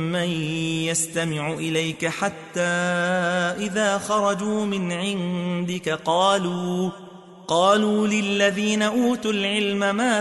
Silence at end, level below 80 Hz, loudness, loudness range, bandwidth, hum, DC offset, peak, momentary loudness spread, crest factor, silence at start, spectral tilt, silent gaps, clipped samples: 0 s; -64 dBFS; -22 LUFS; 2 LU; 12 kHz; none; under 0.1%; -6 dBFS; 7 LU; 16 dB; 0 s; -4 dB/octave; none; under 0.1%